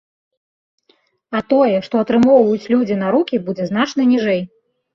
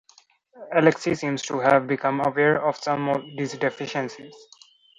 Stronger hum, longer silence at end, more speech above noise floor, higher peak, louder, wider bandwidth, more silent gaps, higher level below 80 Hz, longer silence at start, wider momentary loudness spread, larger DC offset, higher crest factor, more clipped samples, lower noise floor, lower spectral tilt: neither; about the same, 0.5 s vs 0.6 s; first, 45 dB vs 35 dB; about the same, -2 dBFS vs -2 dBFS; first, -16 LUFS vs -23 LUFS; second, 7 kHz vs 10.5 kHz; neither; first, -58 dBFS vs -66 dBFS; first, 1.3 s vs 0.55 s; about the same, 10 LU vs 9 LU; neither; second, 14 dB vs 22 dB; neither; about the same, -60 dBFS vs -58 dBFS; first, -7 dB/octave vs -5.5 dB/octave